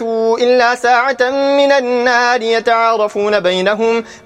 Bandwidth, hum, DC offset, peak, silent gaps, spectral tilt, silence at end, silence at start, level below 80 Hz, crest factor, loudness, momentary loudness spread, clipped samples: 10.5 kHz; none; under 0.1%; 0 dBFS; none; -3.5 dB/octave; 0.05 s; 0 s; -58 dBFS; 12 dB; -13 LUFS; 3 LU; under 0.1%